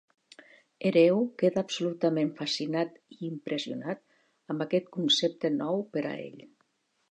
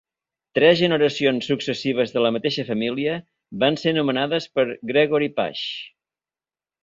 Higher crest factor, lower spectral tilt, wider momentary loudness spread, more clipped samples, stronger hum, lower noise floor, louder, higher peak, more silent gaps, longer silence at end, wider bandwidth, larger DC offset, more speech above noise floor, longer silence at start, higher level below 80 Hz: about the same, 20 dB vs 20 dB; about the same, -5 dB/octave vs -5.5 dB/octave; first, 14 LU vs 10 LU; neither; neither; second, -73 dBFS vs under -90 dBFS; second, -29 LUFS vs -21 LUFS; second, -10 dBFS vs -2 dBFS; neither; second, 0.65 s vs 0.95 s; first, 9.8 kHz vs 7.6 kHz; neither; second, 44 dB vs over 69 dB; first, 0.8 s vs 0.55 s; second, -78 dBFS vs -64 dBFS